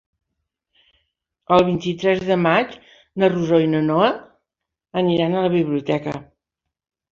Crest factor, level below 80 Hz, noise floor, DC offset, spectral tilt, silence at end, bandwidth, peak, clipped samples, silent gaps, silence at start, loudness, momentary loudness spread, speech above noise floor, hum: 18 dB; -56 dBFS; -83 dBFS; under 0.1%; -7.5 dB/octave; 0.9 s; 7.4 kHz; -2 dBFS; under 0.1%; none; 1.5 s; -19 LUFS; 12 LU; 65 dB; none